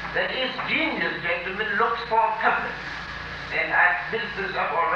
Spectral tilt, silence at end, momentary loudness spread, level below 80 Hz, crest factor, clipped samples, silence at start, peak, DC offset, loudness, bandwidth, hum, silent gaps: -5 dB/octave; 0 s; 11 LU; -50 dBFS; 18 dB; under 0.1%; 0 s; -6 dBFS; under 0.1%; -24 LUFS; 8.6 kHz; none; none